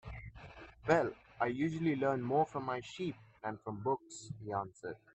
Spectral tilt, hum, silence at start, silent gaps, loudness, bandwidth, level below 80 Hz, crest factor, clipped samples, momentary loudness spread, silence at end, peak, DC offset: -6.5 dB/octave; none; 0.05 s; none; -37 LUFS; 8.6 kHz; -62 dBFS; 22 dB; under 0.1%; 16 LU; 0.2 s; -14 dBFS; under 0.1%